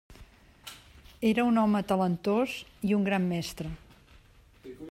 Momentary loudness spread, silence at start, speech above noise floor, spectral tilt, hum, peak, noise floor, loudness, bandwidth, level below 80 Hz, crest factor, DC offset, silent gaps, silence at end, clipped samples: 22 LU; 0.1 s; 30 dB; -6.5 dB/octave; none; -14 dBFS; -57 dBFS; -28 LUFS; 15.5 kHz; -56 dBFS; 16 dB; under 0.1%; none; 0 s; under 0.1%